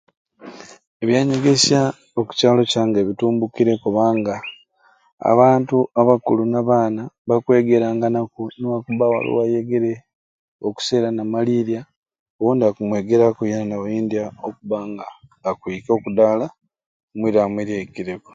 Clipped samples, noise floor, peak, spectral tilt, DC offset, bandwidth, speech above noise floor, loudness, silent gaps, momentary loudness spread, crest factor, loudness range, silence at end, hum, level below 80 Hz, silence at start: under 0.1%; -58 dBFS; 0 dBFS; -5.5 dB/octave; under 0.1%; 9.4 kHz; 39 dB; -19 LUFS; 0.87-1.00 s, 5.12-5.18 s, 7.18-7.25 s, 10.15-10.59 s, 11.97-12.03 s, 12.19-12.39 s, 16.86-17.08 s; 13 LU; 18 dB; 5 LU; 0.15 s; none; -60 dBFS; 0.4 s